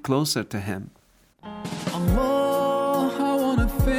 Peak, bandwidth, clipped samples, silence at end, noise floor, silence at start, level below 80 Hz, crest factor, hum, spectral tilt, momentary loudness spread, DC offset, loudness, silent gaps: -8 dBFS; over 20 kHz; under 0.1%; 0 s; -52 dBFS; 0.05 s; -32 dBFS; 16 dB; none; -5.5 dB/octave; 13 LU; under 0.1%; -24 LUFS; none